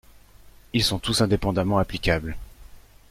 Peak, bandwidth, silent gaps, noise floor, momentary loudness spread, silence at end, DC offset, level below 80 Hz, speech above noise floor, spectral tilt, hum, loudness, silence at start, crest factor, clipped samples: -6 dBFS; 16 kHz; none; -50 dBFS; 8 LU; 0.3 s; under 0.1%; -40 dBFS; 27 dB; -5 dB/octave; none; -23 LUFS; 0.45 s; 20 dB; under 0.1%